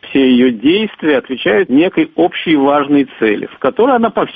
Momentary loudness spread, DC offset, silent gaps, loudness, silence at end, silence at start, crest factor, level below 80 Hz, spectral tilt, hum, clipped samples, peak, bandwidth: 4 LU; under 0.1%; none; -12 LUFS; 0 s; 0.05 s; 12 dB; -52 dBFS; -8.5 dB/octave; none; under 0.1%; 0 dBFS; 4.9 kHz